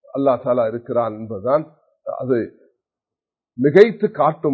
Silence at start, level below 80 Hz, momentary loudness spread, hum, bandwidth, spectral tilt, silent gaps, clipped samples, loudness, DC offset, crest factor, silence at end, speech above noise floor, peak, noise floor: 0.15 s; -62 dBFS; 18 LU; none; 6.4 kHz; -8.5 dB/octave; none; under 0.1%; -18 LUFS; under 0.1%; 20 dB; 0 s; 71 dB; 0 dBFS; -89 dBFS